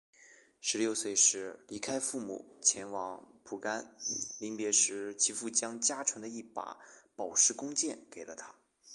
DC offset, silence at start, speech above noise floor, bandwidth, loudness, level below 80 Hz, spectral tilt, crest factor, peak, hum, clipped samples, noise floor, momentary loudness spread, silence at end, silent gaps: under 0.1%; 0.2 s; 26 dB; 12 kHz; -31 LUFS; -80 dBFS; -0.5 dB/octave; 22 dB; -12 dBFS; none; under 0.1%; -61 dBFS; 19 LU; 0 s; none